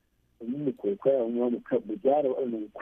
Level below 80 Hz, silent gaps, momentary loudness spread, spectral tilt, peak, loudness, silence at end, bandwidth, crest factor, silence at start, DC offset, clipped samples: -70 dBFS; none; 8 LU; -10 dB/octave; -12 dBFS; -28 LUFS; 0 s; 3.7 kHz; 16 dB; 0.4 s; under 0.1%; under 0.1%